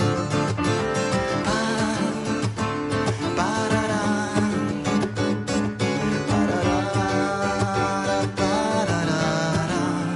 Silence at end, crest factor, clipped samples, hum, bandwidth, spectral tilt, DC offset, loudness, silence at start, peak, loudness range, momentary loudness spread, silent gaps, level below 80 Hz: 0 s; 14 dB; under 0.1%; none; 11.5 kHz; -5.5 dB/octave; under 0.1%; -23 LUFS; 0 s; -8 dBFS; 1 LU; 3 LU; none; -44 dBFS